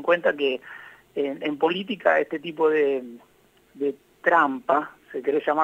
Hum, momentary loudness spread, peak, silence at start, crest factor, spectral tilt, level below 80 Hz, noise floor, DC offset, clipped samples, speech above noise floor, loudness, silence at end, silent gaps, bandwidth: none; 13 LU; -6 dBFS; 0 s; 20 dB; -6 dB/octave; -72 dBFS; -57 dBFS; under 0.1%; under 0.1%; 34 dB; -24 LUFS; 0 s; none; 8 kHz